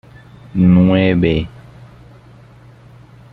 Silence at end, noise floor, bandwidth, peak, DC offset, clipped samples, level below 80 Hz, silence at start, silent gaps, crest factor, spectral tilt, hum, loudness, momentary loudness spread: 1.85 s; -42 dBFS; 4.5 kHz; -2 dBFS; under 0.1%; under 0.1%; -38 dBFS; 0.55 s; none; 16 dB; -10 dB/octave; none; -13 LUFS; 14 LU